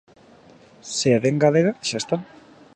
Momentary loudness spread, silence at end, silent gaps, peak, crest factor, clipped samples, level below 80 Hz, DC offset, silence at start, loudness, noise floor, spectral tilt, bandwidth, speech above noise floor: 11 LU; 0.5 s; none; -4 dBFS; 20 dB; under 0.1%; -62 dBFS; under 0.1%; 0.85 s; -21 LUFS; -50 dBFS; -5 dB/octave; 11 kHz; 30 dB